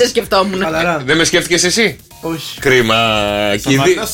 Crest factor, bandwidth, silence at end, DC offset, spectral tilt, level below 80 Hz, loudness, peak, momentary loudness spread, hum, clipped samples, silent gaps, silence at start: 14 dB; 17 kHz; 0 s; under 0.1%; -3.5 dB/octave; -40 dBFS; -13 LUFS; 0 dBFS; 8 LU; none; under 0.1%; none; 0 s